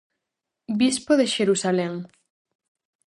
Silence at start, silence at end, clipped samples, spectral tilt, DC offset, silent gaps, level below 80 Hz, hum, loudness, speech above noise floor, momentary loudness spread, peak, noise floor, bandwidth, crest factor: 0.7 s; 1 s; under 0.1%; -4 dB/octave; under 0.1%; none; -66 dBFS; none; -22 LUFS; 62 dB; 11 LU; -6 dBFS; -84 dBFS; 11.5 kHz; 18 dB